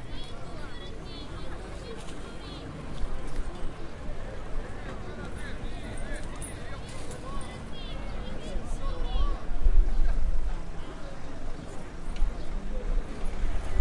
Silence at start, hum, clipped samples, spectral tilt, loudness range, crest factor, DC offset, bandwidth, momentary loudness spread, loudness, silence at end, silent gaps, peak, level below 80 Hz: 0 s; none; under 0.1%; -5.5 dB/octave; 6 LU; 18 dB; under 0.1%; 11 kHz; 9 LU; -38 LUFS; 0 s; none; -8 dBFS; -30 dBFS